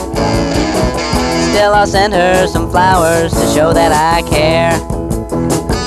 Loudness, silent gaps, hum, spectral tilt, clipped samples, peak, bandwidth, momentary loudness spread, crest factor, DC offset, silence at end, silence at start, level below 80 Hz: -12 LUFS; none; none; -5 dB/octave; under 0.1%; -2 dBFS; 15.5 kHz; 5 LU; 10 dB; under 0.1%; 0 s; 0 s; -24 dBFS